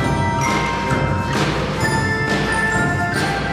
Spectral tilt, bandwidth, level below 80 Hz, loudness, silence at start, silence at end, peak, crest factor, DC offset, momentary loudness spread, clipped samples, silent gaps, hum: -5 dB/octave; 16 kHz; -34 dBFS; -18 LUFS; 0 s; 0 s; -4 dBFS; 14 dB; under 0.1%; 2 LU; under 0.1%; none; none